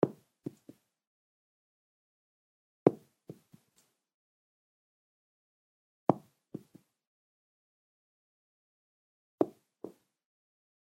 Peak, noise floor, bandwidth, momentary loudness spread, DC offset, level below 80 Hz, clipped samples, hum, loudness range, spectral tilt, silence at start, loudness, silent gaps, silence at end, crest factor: -4 dBFS; -74 dBFS; 16 kHz; 24 LU; under 0.1%; -84 dBFS; under 0.1%; none; 4 LU; -9.5 dB/octave; 0.05 s; -33 LUFS; 1.07-2.86 s, 4.14-6.07 s, 7.07-9.38 s; 1.1 s; 36 dB